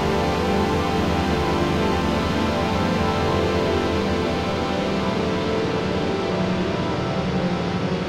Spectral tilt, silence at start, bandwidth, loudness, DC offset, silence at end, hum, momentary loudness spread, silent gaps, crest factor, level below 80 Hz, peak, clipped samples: -6 dB/octave; 0 s; 16 kHz; -22 LUFS; under 0.1%; 0 s; none; 2 LU; none; 12 dB; -36 dBFS; -8 dBFS; under 0.1%